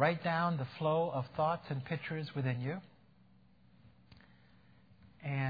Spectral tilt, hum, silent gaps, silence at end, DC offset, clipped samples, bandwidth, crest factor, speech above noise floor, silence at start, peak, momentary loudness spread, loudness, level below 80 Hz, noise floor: -5.5 dB/octave; none; none; 0 s; under 0.1%; under 0.1%; 5 kHz; 22 dB; 31 dB; 0 s; -16 dBFS; 7 LU; -36 LUFS; -72 dBFS; -65 dBFS